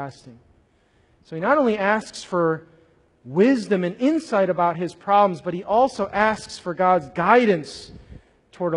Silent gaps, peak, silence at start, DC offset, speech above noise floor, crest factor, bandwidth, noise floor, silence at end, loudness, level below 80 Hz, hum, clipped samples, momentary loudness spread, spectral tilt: none; -2 dBFS; 0 s; under 0.1%; 40 dB; 20 dB; 11 kHz; -60 dBFS; 0 s; -21 LUFS; -56 dBFS; none; under 0.1%; 12 LU; -6 dB/octave